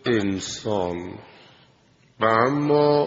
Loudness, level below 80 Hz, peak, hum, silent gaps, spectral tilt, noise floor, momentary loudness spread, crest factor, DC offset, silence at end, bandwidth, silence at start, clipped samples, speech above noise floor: -22 LUFS; -60 dBFS; -4 dBFS; none; none; -4.5 dB/octave; -58 dBFS; 15 LU; 20 dB; under 0.1%; 0 s; 7.8 kHz; 0.05 s; under 0.1%; 36 dB